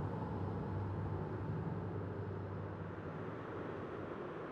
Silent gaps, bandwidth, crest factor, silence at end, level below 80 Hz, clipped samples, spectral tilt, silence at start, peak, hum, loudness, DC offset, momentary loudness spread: none; 5.8 kHz; 12 dB; 0 s; -58 dBFS; under 0.1%; -9.5 dB/octave; 0 s; -30 dBFS; none; -43 LUFS; under 0.1%; 4 LU